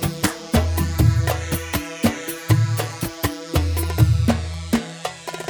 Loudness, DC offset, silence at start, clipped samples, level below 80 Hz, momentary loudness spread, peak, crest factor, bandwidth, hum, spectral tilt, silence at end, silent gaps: -22 LUFS; under 0.1%; 0 s; under 0.1%; -30 dBFS; 8 LU; -2 dBFS; 18 dB; 19.5 kHz; none; -5.5 dB/octave; 0 s; none